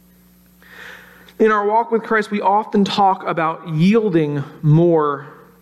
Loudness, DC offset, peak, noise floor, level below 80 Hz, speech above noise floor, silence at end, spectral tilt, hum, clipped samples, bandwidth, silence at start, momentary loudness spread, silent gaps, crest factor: -17 LUFS; under 0.1%; -4 dBFS; -50 dBFS; -58 dBFS; 34 dB; 0.3 s; -7.5 dB/octave; none; under 0.1%; 12.5 kHz; 0.75 s; 8 LU; none; 14 dB